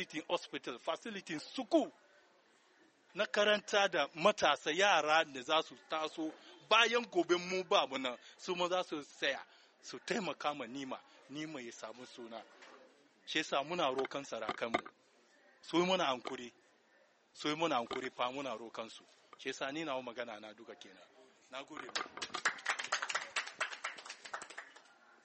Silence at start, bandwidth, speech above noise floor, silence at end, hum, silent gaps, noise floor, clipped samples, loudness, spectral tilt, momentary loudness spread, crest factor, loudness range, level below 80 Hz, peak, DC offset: 0 s; 8.4 kHz; 33 dB; 0.55 s; none; none; -70 dBFS; under 0.1%; -36 LUFS; -3 dB/octave; 19 LU; 24 dB; 11 LU; -84 dBFS; -14 dBFS; under 0.1%